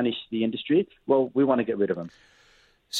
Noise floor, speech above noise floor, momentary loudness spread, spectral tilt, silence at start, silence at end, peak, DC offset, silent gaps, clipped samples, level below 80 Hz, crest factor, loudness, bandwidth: -60 dBFS; 35 dB; 5 LU; -5.5 dB/octave; 0 s; 0 s; -8 dBFS; under 0.1%; none; under 0.1%; -68 dBFS; 18 dB; -25 LUFS; 15 kHz